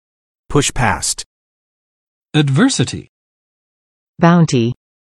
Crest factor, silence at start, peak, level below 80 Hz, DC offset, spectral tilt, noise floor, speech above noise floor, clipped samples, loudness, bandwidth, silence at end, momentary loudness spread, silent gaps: 18 dB; 0.5 s; 0 dBFS; -36 dBFS; under 0.1%; -5 dB/octave; under -90 dBFS; over 76 dB; under 0.1%; -15 LUFS; 12.5 kHz; 0.35 s; 13 LU; 1.26-2.22 s, 3.09-4.14 s